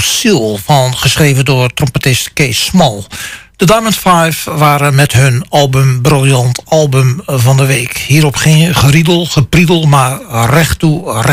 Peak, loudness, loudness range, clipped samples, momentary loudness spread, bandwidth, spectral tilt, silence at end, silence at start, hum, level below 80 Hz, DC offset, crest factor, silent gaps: 0 dBFS; -9 LUFS; 2 LU; under 0.1%; 5 LU; 16 kHz; -5 dB/octave; 0 s; 0 s; none; -32 dBFS; under 0.1%; 8 dB; none